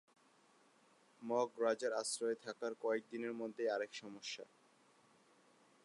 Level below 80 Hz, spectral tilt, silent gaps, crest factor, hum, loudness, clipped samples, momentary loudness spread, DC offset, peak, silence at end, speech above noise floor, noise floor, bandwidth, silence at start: under -90 dBFS; -2.5 dB/octave; none; 20 dB; none; -41 LUFS; under 0.1%; 10 LU; under 0.1%; -24 dBFS; 1.4 s; 30 dB; -71 dBFS; 11 kHz; 1.2 s